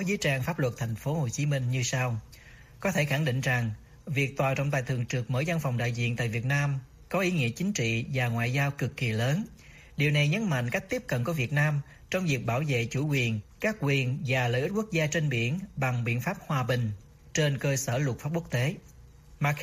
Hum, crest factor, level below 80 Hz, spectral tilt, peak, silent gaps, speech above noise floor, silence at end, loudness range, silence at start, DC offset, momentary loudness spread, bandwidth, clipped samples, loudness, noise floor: none; 16 dB; -56 dBFS; -5.5 dB/octave; -12 dBFS; none; 24 dB; 0 s; 1 LU; 0 s; under 0.1%; 6 LU; 15.5 kHz; under 0.1%; -29 LUFS; -52 dBFS